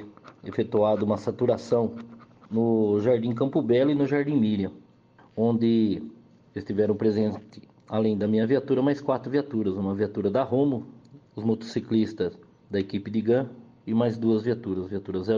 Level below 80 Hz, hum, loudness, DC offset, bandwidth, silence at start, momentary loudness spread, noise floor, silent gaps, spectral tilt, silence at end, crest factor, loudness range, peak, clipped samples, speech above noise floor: -66 dBFS; none; -26 LUFS; under 0.1%; 7.2 kHz; 0 s; 11 LU; -56 dBFS; none; -8.5 dB/octave; 0 s; 16 dB; 3 LU; -10 dBFS; under 0.1%; 32 dB